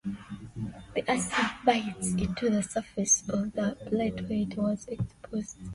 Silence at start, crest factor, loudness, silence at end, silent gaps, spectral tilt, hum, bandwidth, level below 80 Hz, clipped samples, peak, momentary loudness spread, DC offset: 0.05 s; 20 dB; -30 LUFS; 0 s; none; -4 dB/octave; none; 11.5 kHz; -52 dBFS; under 0.1%; -10 dBFS; 13 LU; under 0.1%